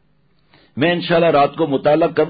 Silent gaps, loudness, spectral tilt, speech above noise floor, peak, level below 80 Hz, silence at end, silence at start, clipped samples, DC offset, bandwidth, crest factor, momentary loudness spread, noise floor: none; -16 LUFS; -11.5 dB/octave; 45 dB; -4 dBFS; -54 dBFS; 0 s; 0.75 s; under 0.1%; under 0.1%; 5 kHz; 12 dB; 5 LU; -60 dBFS